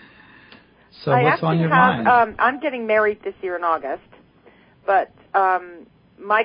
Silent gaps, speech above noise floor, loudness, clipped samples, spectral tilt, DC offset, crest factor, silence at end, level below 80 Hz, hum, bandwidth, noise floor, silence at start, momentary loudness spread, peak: none; 33 dB; -19 LUFS; under 0.1%; -11 dB/octave; under 0.1%; 18 dB; 0 s; -58 dBFS; none; 5.2 kHz; -52 dBFS; 1 s; 14 LU; -2 dBFS